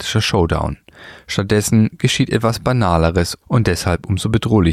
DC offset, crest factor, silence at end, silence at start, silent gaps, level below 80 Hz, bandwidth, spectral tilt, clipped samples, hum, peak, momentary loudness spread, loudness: under 0.1%; 16 dB; 0 s; 0 s; none; -32 dBFS; 15.5 kHz; -5.5 dB/octave; under 0.1%; none; -2 dBFS; 6 LU; -17 LUFS